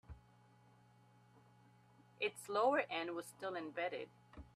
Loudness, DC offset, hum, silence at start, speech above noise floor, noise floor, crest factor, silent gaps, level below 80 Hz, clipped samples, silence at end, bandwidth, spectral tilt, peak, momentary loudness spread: -40 LUFS; under 0.1%; none; 0.1 s; 28 dB; -68 dBFS; 22 dB; none; -70 dBFS; under 0.1%; 0.1 s; 14 kHz; -4 dB/octave; -22 dBFS; 23 LU